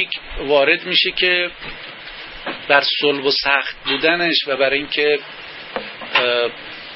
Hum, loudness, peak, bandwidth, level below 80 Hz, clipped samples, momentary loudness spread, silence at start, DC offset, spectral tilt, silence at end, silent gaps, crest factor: none; -16 LUFS; 0 dBFS; 5.8 kHz; -44 dBFS; under 0.1%; 17 LU; 0 s; under 0.1%; -6.5 dB/octave; 0 s; none; 20 dB